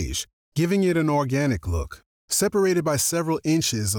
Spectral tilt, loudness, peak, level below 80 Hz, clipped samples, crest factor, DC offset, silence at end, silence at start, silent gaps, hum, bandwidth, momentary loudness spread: -4.5 dB/octave; -23 LUFS; -12 dBFS; -40 dBFS; under 0.1%; 12 dB; under 0.1%; 0 s; 0 s; 0.33-0.52 s, 2.06-2.28 s; none; over 20 kHz; 9 LU